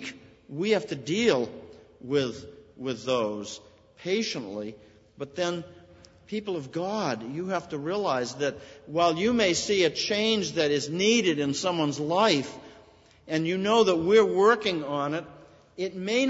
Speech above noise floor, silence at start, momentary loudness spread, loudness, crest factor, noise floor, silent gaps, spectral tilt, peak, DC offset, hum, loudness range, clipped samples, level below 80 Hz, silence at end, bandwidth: 29 dB; 0 s; 16 LU; -26 LUFS; 20 dB; -55 dBFS; none; -4 dB/octave; -8 dBFS; under 0.1%; none; 9 LU; under 0.1%; -64 dBFS; 0 s; 8 kHz